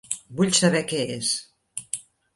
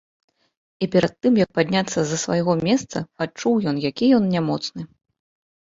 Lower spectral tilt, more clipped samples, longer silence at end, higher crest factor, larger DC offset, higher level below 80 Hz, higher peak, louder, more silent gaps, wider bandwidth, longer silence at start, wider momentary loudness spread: second, -3.5 dB/octave vs -5.5 dB/octave; neither; second, 0.35 s vs 0.75 s; about the same, 20 dB vs 18 dB; neither; second, -64 dBFS vs -56 dBFS; about the same, -4 dBFS vs -4 dBFS; second, -24 LUFS vs -21 LUFS; neither; first, 11.5 kHz vs 7.8 kHz; second, 0.1 s vs 0.8 s; first, 15 LU vs 11 LU